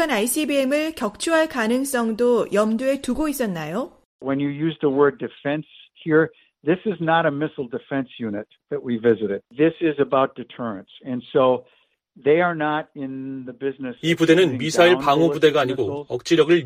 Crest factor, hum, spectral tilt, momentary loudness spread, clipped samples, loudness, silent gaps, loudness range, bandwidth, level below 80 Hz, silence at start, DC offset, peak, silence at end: 18 dB; none; -5 dB/octave; 14 LU; under 0.1%; -21 LUFS; 4.05-4.19 s; 4 LU; 15.5 kHz; -54 dBFS; 0 s; under 0.1%; -2 dBFS; 0 s